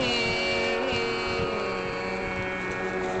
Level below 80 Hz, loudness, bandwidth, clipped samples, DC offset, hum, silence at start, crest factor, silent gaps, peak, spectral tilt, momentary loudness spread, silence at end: -48 dBFS; -27 LUFS; 8.8 kHz; under 0.1%; 0.1%; none; 0 s; 16 dB; none; -12 dBFS; -4 dB/octave; 5 LU; 0 s